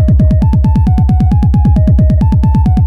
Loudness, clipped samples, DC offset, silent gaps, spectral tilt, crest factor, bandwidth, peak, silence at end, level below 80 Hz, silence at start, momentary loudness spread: -10 LUFS; under 0.1%; under 0.1%; none; -10.5 dB/octave; 6 dB; 5.4 kHz; 0 dBFS; 0 s; -12 dBFS; 0 s; 1 LU